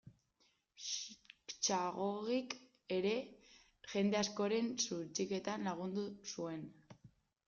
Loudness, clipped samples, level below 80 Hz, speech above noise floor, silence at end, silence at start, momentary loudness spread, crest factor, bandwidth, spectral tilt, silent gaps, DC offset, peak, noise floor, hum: -40 LUFS; under 0.1%; -78 dBFS; 39 dB; 0.4 s; 0.05 s; 13 LU; 20 dB; 7.6 kHz; -3.5 dB/octave; none; under 0.1%; -20 dBFS; -78 dBFS; none